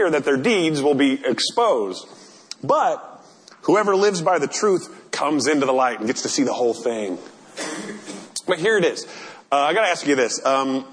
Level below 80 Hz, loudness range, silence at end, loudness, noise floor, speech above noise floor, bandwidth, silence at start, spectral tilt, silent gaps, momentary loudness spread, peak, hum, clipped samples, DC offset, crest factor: -72 dBFS; 3 LU; 0 s; -20 LUFS; -47 dBFS; 27 dB; 10.5 kHz; 0 s; -3.5 dB/octave; none; 13 LU; -6 dBFS; none; under 0.1%; under 0.1%; 16 dB